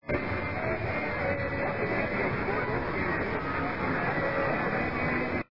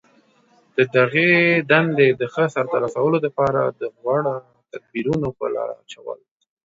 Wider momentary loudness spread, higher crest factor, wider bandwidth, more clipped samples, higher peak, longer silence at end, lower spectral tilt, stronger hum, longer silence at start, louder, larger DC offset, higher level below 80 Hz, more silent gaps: second, 3 LU vs 19 LU; second, 14 dB vs 20 dB; second, 5.8 kHz vs 7.8 kHz; neither; second, -16 dBFS vs 0 dBFS; second, 0 s vs 0.5 s; first, -8.5 dB/octave vs -7 dB/octave; neither; second, 0 s vs 0.75 s; second, -30 LUFS vs -19 LUFS; first, 0.5% vs under 0.1%; first, -48 dBFS vs -58 dBFS; neither